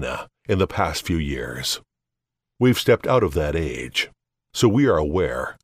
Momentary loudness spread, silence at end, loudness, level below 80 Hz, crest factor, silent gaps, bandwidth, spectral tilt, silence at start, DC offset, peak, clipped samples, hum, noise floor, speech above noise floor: 10 LU; 0.1 s; -22 LUFS; -38 dBFS; 18 dB; none; 16 kHz; -5.5 dB/octave; 0 s; under 0.1%; -4 dBFS; under 0.1%; none; -84 dBFS; 63 dB